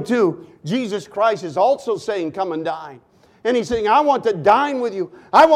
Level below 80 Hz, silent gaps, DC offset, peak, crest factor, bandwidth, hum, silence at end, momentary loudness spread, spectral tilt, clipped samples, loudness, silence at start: -54 dBFS; none; under 0.1%; -2 dBFS; 16 dB; 14 kHz; none; 0 s; 11 LU; -5.5 dB/octave; under 0.1%; -19 LUFS; 0 s